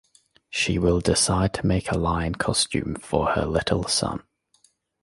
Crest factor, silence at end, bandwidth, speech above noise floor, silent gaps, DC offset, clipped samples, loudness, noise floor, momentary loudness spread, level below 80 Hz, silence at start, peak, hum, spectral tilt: 20 dB; 0.8 s; 11.5 kHz; 40 dB; none; under 0.1%; under 0.1%; -23 LUFS; -64 dBFS; 7 LU; -38 dBFS; 0.5 s; -4 dBFS; none; -4 dB/octave